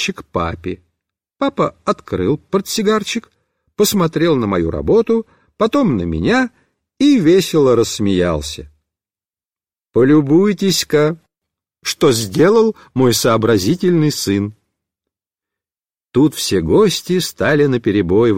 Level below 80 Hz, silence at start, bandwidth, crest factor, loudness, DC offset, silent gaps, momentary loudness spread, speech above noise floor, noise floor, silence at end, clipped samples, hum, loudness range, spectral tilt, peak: -42 dBFS; 0 s; 16.5 kHz; 14 dB; -15 LUFS; under 0.1%; none; 10 LU; over 76 dB; under -90 dBFS; 0 s; under 0.1%; none; 4 LU; -5 dB/octave; -2 dBFS